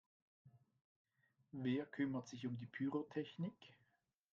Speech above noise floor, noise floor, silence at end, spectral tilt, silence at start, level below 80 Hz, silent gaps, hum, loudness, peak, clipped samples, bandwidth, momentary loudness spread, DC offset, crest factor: 39 dB; -84 dBFS; 0.6 s; -6.5 dB/octave; 0.45 s; -86 dBFS; 0.81-1.05 s; none; -45 LUFS; -30 dBFS; under 0.1%; 7.4 kHz; 7 LU; under 0.1%; 18 dB